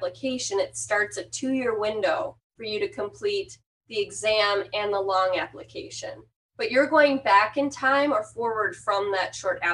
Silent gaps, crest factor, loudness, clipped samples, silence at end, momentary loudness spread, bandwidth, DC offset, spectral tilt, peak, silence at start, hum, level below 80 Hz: 2.44-2.50 s, 3.66-3.81 s, 6.36-6.49 s; 20 dB; -25 LUFS; under 0.1%; 0 s; 15 LU; 11.5 kHz; under 0.1%; -2.5 dB/octave; -6 dBFS; 0 s; none; -64 dBFS